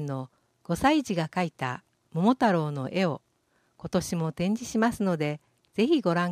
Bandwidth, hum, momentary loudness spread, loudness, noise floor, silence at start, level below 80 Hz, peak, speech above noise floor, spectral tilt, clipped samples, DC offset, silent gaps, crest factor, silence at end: 15 kHz; none; 13 LU; -27 LUFS; -70 dBFS; 0 s; -58 dBFS; -10 dBFS; 44 dB; -6 dB/octave; under 0.1%; under 0.1%; none; 18 dB; 0 s